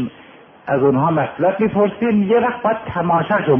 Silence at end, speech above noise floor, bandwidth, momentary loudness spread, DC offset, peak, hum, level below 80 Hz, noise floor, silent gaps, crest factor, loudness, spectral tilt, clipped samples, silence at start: 0 s; 27 dB; 3.6 kHz; 6 LU; under 0.1%; -2 dBFS; none; -52 dBFS; -43 dBFS; none; 14 dB; -17 LUFS; -11 dB/octave; under 0.1%; 0 s